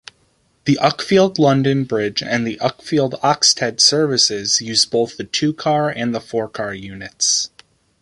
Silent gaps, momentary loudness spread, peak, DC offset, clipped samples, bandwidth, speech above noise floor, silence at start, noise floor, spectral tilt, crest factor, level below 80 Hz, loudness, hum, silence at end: none; 11 LU; 0 dBFS; under 0.1%; under 0.1%; 11.5 kHz; 43 dB; 0.65 s; -60 dBFS; -3 dB/octave; 18 dB; -56 dBFS; -17 LUFS; none; 0.55 s